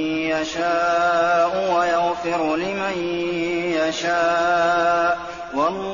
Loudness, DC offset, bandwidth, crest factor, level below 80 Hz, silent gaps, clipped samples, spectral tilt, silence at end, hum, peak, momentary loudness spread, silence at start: -20 LUFS; 0.2%; 7.2 kHz; 12 dB; -54 dBFS; none; under 0.1%; -2.5 dB/octave; 0 s; none; -8 dBFS; 6 LU; 0 s